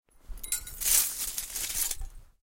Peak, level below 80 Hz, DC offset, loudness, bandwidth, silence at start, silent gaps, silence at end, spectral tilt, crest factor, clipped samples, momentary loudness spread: -8 dBFS; -44 dBFS; under 0.1%; -28 LUFS; 17 kHz; 0.25 s; none; 0.15 s; 1.5 dB/octave; 24 dB; under 0.1%; 11 LU